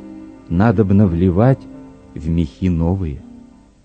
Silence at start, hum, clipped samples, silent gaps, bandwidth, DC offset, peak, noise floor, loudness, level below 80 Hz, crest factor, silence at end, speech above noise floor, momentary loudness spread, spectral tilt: 0 s; none; under 0.1%; none; 7.2 kHz; under 0.1%; 0 dBFS; -43 dBFS; -17 LUFS; -34 dBFS; 18 dB; 0.5 s; 28 dB; 22 LU; -10 dB/octave